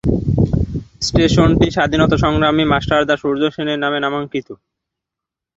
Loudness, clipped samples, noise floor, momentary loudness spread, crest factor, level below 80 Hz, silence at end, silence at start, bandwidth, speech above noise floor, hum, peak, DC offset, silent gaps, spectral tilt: -16 LUFS; under 0.1%; -84 dBFS; 9 LU; 16 dB; -30 dBFS; 1.05 s; 0.05 s; 8 kHz; 69 dB; none; 0 dBFS; under 0.1%; none; -6 dB/octave